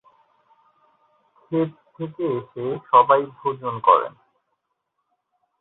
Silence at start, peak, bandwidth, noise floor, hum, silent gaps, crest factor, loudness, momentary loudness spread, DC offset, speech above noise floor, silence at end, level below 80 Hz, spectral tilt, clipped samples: 1.5 s; -2 dBFS; 4.1 kHz; -76 dBFS; none; none; 22 dB; -21 LUFS; 14 LU; under 0.1%; 56 dB; 1.5 s; -72 dBFS; -10.5 dB/octave; under 0.1%